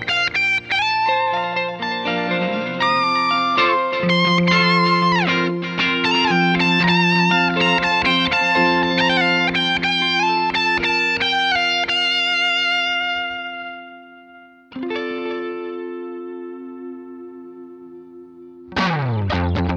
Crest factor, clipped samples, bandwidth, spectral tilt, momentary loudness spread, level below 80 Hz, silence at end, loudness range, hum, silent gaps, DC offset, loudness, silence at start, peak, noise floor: 14 dB; under 0.1%; 8.8 kHz; -5 dB/octave; 16 LU; -46 dBFS; 0 s; 14 LU; none; none; under 0.1%; -17 LUFS; 0 s; -4 dBFS; -45 dBFS